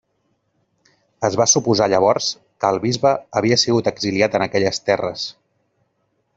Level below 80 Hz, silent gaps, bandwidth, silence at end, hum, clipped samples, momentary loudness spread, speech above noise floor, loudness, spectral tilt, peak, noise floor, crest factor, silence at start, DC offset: -58 dBFS; none; 8 kHz; 1.05 s; none; under 0.1%; 8 LU; 50 dB; -18 LUFS; -3.5 dB/octave; -2 dBFS; -68 dBFS; 18 dB; 1.2 s; under 0.1%